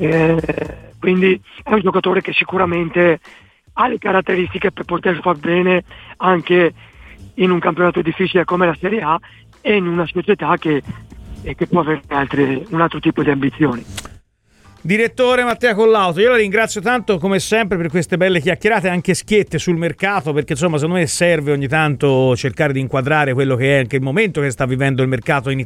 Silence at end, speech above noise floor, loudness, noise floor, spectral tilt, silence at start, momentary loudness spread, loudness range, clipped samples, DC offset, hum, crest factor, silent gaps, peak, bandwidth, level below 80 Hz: 0 s; 36 dB; -16 LUFS; -51 dBFS; -5.5 dB/octave; 0 s; 6 LU; 3 LU; under 0.1%; under 0.1%; none; 14 dB; none; -2 dBFS; 14.5 kHz; -44 dBFS